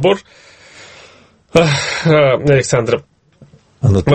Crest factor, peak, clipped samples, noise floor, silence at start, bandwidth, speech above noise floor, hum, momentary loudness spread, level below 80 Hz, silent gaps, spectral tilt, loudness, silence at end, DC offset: 14 dB; 0 dBFS; under 0.1%; -46 dBFS; 0 s; 8.8 kHz; 33 dB; none; 8 LU; -42 dBFS; none; -5.5 dB/octave; -14 LUFS; 0 s; under 0.1%